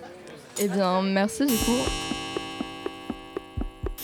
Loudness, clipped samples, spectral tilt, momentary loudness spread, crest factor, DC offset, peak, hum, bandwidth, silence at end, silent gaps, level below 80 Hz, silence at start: -27 LUFS; under 0.1%; -4 dB/octave; 13 LU; 16 dB; under 0.1%; -12 dBFS; none; over 20 kHz; 0 s; none; -40 dBFS; 0 s